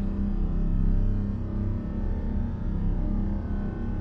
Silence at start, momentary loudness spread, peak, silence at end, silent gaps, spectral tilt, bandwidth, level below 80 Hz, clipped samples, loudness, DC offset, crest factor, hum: 0 s; 4 LU; -14 dBFS; 0 s; none; -11 dB/octave; 3.2 kHz; -28 dBFS; under 0.1%; -30 LUFS; under 0.1%; 12 dB; none